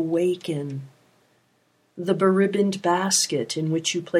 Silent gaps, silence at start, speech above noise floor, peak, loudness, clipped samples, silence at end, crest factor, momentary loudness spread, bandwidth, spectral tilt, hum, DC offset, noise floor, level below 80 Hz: none; 0 s; 43 dB; -6 dBFS; -23 LUFS; under 0.1%; 0 s; 18 dB; 11 LU; 15.5 kHz; -4 dB/octave; none; under 0.1%; -65 dBFS; -74 dBFS